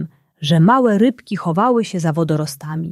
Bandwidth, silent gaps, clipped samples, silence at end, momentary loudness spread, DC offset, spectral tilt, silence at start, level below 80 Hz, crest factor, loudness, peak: 13 kHz; none; under 0.1%; 0 s; 12 LU; under 0.1%; -7 dB/octave; 0 s; -60 dBFS; 14 dB; -17 LUFS; -4 dBFS